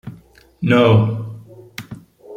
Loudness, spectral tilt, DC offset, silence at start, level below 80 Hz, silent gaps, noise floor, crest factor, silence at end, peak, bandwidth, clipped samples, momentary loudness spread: -16 LUFS; -8 dB/octave; under 0.1%; 0.05 s; -52 dBFS; none; -45 dBFS; 18 dB; 0 s; -2 dBFS; 15.5 kHz; under 0.1%; 25 LU